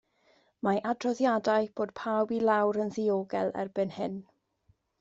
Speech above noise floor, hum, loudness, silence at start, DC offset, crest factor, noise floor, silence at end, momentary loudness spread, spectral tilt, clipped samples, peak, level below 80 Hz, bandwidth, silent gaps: 41 dB; none; -30 LUFS; 0.65 s; under 0.1%; 18 dB; -70 dBFS; 0.8 s; 8 LU; -6.5 dB/octave; under 0.1%; -12 dBFS; -72 dBFS; 8 kHz; none